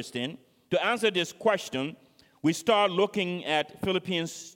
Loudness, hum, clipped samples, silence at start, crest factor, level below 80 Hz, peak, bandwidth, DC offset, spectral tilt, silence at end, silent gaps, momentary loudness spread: -28 LUFS; none; under 0.1%; 0 s; 18 dB; -66 dBFS; -10 dBFS; 16.5 kHz; under 0.1%; -4 dB/octave; 0.05 s; none; 10 LU